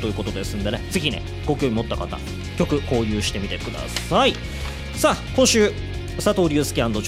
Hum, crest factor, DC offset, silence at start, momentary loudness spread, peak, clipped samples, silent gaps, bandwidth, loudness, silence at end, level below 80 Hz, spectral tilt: none; 16 dB; under 0.1%; 0 s; 11 LU; -6 dBFS; under 0.1%; none; 16 kHz; -22 LUFS; 0 s; -34 dBFS; -4.5 dB/octave